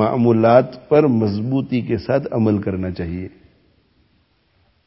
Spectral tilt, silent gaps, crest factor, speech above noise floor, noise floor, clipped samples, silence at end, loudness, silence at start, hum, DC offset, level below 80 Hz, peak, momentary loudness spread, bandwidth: -12.5 dB/octave; none; 18 dB; 44 dB; -61 dBFS; under 0.1%; 1.6 s; -18 LUFS; 0 s; none; under 0.1%; -44 dBFS; 0 dBFS; 13 LU; 5.8 kHz